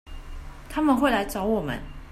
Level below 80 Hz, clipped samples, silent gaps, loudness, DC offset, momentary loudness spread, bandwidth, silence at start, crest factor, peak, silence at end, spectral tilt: -40 dBFS; under 0.1%; none; -25 LUFS; under 0.1%; 22 LU; 14.5 kHz; 0.05 s; 18 dB; -8 dBFS; 0 s; -5.5 dB/octave